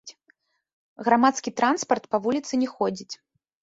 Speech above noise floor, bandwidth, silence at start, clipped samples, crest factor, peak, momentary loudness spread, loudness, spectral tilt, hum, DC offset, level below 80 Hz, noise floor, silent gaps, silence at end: 42 dB; 8 kHz; 0.05 s; under 0.1%; 20 dB; -6 dBFS; 14 LU; -24 LUFS; -4 dB/octave; none; under 0.1%; -70 dBFS; -66 dBFS; 0.73-0.96 s; 0.45 s